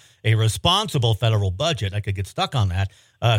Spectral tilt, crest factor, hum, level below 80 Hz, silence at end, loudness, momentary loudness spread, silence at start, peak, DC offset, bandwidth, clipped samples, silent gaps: -5 dB/octave; 18 dB; none; -48 dBFS; 0 s; -22 LUFS; 8 LU; 0.25 s; -4 dBFS; under 0.1%; 16 kHz; under 0.1%; none